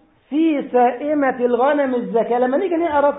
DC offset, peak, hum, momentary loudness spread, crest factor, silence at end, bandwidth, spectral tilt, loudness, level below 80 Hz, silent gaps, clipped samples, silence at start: under 0.1%; -6 dBFS; none; 3 LU; 12 dB; 0 s; 4 kHz; -11 dB/octave; -18 LUFS; -58 dBFS; none; under 0.1%; 0.3 s